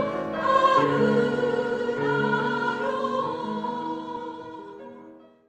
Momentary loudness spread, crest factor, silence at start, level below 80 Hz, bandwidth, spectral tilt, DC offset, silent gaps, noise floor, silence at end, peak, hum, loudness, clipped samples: 19 LU; 18 dB; 0 s; -64 dBFS; 9.2 kHz; -6.5 dB/octave; under 0.1%; none; -48 dBFS; 0.3 s; -8 dBFS; none; -25 LUFS; under 0.1%